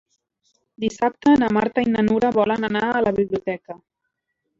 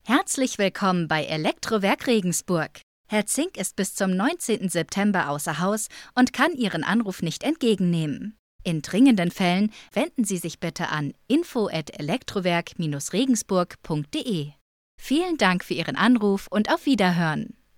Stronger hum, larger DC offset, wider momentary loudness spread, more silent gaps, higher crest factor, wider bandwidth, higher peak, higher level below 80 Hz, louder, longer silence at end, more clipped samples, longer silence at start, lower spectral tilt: neither; neither; first, 12 LU vs 8 LU; second, none vs 2.83-3.04 s, 8.39-8.59 s, 14.61-14.98 s; about the same, 16 dB vs 20 dB; second, 7.6 kHz vs 16.5 kHz; about the same, -6 dBFS vs -4 dBFS; about the same, -54 dBFS vs -58 dBFS; first, -20 LUFS vs -24 LUFS; first, 0.85 s vs 0.3 s; neither; first, 0.8 s vs 0.05 s; first, -6.5 dB/octave vs -4.5 dB/octave